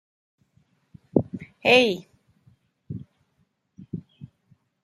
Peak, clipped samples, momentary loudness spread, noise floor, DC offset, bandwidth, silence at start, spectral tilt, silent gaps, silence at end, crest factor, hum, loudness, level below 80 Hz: -2 dBFS; under 0.1%; 22 LU; -70 dBFS; under 0.1%; 13 kHz; 1.15 s; -5 dB/octave; none; 0.6 s; 26 dB; none; -22 LUFS; -66 dBFS